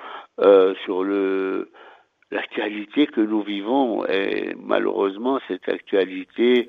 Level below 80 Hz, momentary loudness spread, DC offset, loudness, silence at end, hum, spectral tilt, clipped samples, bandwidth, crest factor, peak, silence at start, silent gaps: -70 dBFS; 11 LU; under 0.1%; -22 LUFS; 0 s; none; -7 dB/octave; under 0.1%; 4.9 kHz; 18 dB; -2 dBFS; 0 s; none